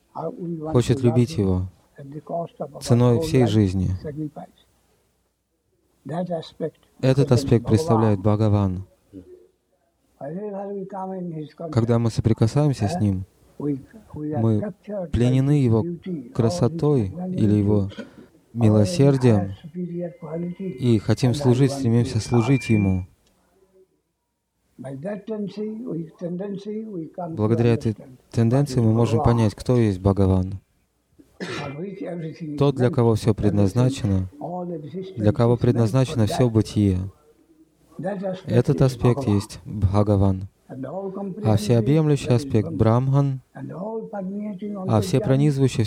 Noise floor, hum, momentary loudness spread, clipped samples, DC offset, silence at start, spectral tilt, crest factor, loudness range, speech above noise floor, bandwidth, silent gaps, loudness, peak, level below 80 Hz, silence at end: -75 dBFS; none; 14 LU; under 0.1%; under 0.1%; 0.15 s; -8 dB/octave; 18 dB; 6 LU; 54 dB; 13 kHz; none; -22 LUFS; -4 dBFS; -46 dBFS; 0 s